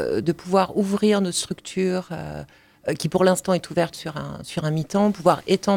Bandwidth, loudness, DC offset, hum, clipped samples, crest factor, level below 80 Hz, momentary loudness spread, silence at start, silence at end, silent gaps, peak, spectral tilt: 17 kHz; -23 LUFS; under 0.1%; none; under 0.1%; 18 dB; -56 dBFS; 13 LU; 0 s; 0 s; none; -4 dBFS; -5.5 dB/octave